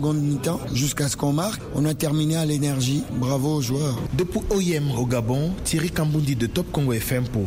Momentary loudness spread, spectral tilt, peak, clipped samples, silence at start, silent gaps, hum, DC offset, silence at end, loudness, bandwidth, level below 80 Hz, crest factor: 3 LU; -5.5 dB/octave; -10 dBFS; under 0.1%; 0 s; none; none; 0.1%; 0 s; -23 LUFS; 16 kHz; -40 dBFS; 14 dB